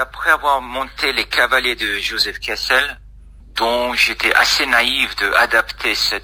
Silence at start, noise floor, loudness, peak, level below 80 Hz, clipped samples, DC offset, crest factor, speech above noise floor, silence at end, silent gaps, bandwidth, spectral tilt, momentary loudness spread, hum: 0 s; -40 dBFS; -16 LUFS; 0 dBFS; -40 dBFS; under 0.1%; under 0.1%; 18 dB; 23 dB; 0 s; none; 16 kHz; -1 dB/octave; 7 LU; none